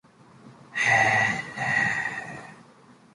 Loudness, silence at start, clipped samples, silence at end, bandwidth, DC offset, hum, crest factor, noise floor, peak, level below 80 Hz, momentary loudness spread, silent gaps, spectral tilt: -23 LUFS; 0.45 s; under 0.1%; 0.5 s; 11.5 kHz; under 0.1%; none; 18 dB; -54 dBFS; -8 dBFS; -62 dBFS; 17 LU; none; -3.5 dB/octave